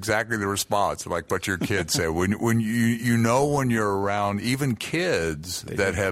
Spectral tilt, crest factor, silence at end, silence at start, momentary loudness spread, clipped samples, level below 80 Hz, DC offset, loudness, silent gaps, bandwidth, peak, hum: -5 dB/octave; 16 dB; 0 s; 0 s; 5 LU; under 0.1%; -48 dBFS; under 0.1%; -24 LUFS; none; 16 kHz; -6 dBFS; none